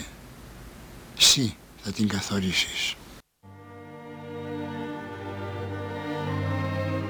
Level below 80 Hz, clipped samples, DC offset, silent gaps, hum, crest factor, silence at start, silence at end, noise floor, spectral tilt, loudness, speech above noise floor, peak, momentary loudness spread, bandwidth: -54 dBFS; under 0.1%; under 0.1%; none; none; 24 dB; 0 s; 0 s; -49 dBFS; -3 dB/octave; -26 LUFS; 25 dB; -6 dBFS; 26 LU; over 20 kHz